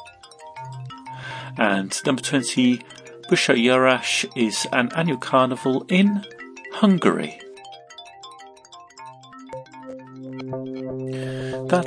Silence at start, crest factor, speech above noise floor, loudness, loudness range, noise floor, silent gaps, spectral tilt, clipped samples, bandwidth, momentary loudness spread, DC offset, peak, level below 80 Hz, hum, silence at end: 0 s; 22 dB; 26 dB; -21 LUFS; 16 LU; -46 dBFS; none; -4.5 dB/octave; under 0.1%; 10.5 kHz; 23 LU; under 0.1%; -2 dBFS; -66 dBFS; none; 0 s